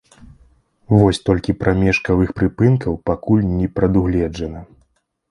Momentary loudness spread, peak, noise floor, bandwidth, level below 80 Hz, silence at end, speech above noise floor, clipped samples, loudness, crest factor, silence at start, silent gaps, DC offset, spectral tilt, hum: 8 LU; 0 dBFS; -63 dBFS; 11 kHz; -34 dBFS; 0.65 s; 46 dB; under 0.1%; -17 LUFS; 18 dB; 0.9 s; none; under 0.1%; -8 dB/octave; none